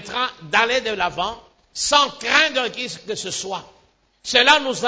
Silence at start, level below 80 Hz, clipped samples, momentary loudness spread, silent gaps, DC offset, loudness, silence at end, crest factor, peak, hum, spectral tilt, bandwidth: 0 s; -54 dBFS; under 0.1%; 14 LU; none; under 0.1%; -19 LUFS; 0 s; 20 dB; 0 dBFS; none; -1 dB/octave; 8 kHz